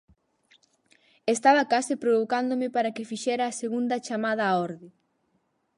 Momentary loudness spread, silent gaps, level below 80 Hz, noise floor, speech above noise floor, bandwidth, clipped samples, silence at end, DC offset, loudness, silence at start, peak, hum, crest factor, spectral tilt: 10 LU; none; -76 dBFS; -72 dBFS; 47 dB; 11.5 kHz; under 0.1%; 0.9 s; under 0.1%; -26 LUFS; 1.25 s; -8 dBFS; none; 20 dB; -4 dB/octave